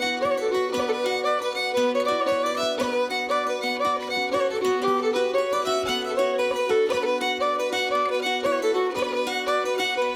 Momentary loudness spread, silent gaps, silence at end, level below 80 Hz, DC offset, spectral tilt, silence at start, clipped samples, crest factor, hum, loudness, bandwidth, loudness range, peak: 2 LU; none; 0 s; -64 dBFS; under 0.1%; -2.5 dB/octave; 0 s; under 0.1%; 14 dB; none; -24 LUFS; 17 kHz; 1 LU; -10 dBFS